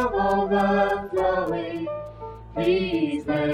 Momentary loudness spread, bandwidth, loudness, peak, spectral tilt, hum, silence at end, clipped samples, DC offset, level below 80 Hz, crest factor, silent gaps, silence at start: 13 LU; 14 kHz; -24 LUFS; -10 dBFS; -7 dB/octave; none; 0 s; under 0.1%; under 0.1%; -46 dBFS; 14 dB; none; 0 s